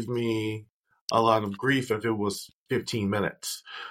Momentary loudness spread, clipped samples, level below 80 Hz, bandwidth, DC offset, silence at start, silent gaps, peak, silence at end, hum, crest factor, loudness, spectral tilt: 12 LU; under 0.1%; -66 dBFS; 16.5 kHz; under 0.1%; 0 s; 0.70-0.84 s, 1.01-1.08 s, 2.53-2.66 s; -8 dBFS; 0 s; none; 22 dB; -28 LUFS; -5 dB/octave